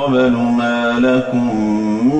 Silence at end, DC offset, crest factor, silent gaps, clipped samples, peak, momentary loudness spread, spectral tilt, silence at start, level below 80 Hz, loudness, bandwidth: 0 s; under 0.1%; 10 dB; none; under 0.1%; -6 dBFS; 3 LU; -7 dB/octave; 0 s; -46 dBFS; -15 LUFS; 8.4 kHz